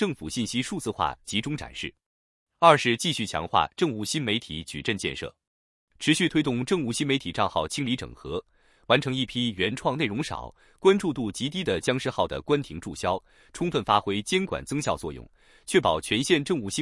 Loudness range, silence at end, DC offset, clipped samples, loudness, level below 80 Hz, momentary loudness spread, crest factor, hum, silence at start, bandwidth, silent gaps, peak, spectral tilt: 3 LU; 0 s; under 0.1%; under 0.1%; -26 LUFS; -54 dBFS; 12 LU; 24 dB; none; 0 s; 12 kHz; 2.06-2.47 s, 5.47-5.88 s; -4 dBFS; -4.5 dB/octave